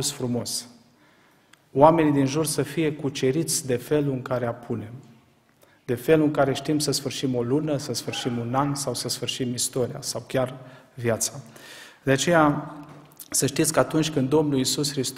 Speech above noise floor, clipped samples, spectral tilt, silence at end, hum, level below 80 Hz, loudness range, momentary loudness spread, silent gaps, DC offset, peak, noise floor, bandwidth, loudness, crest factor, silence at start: 35 dB; under 0.1%; -4.5 dB/octave; 0 s; none; -56 dBFS; 4 LU; 13 LU; none; under 0.1%; -2 dBFS; -59 dBFS; 16 kHz; -24 LUFS; 24 dB; 0 s